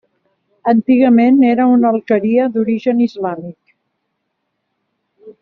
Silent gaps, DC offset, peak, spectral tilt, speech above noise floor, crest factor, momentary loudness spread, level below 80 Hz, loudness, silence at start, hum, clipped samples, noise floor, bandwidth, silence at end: none; under 0.1%; -2 dBFS; -6.5 dB/octave; 59 dB; 14 dB; 13 LU; -60 dBFS; -13 LUFS; 0.65 s; none; under 0.1%; -71 dBFS; 5.4 kHz; 0.1 s